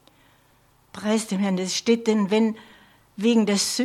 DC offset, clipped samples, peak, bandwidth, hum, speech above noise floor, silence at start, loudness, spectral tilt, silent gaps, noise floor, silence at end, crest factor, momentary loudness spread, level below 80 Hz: under 0.1%; under 0.1%; -8 dBFS; 14.5 kHz; none; 38 dB; 0.95 s; -23 LUFS; -4.5 dB/octave; none; -59 dBFS; 0 s; 16 dB; 9 LU; -68 dBFS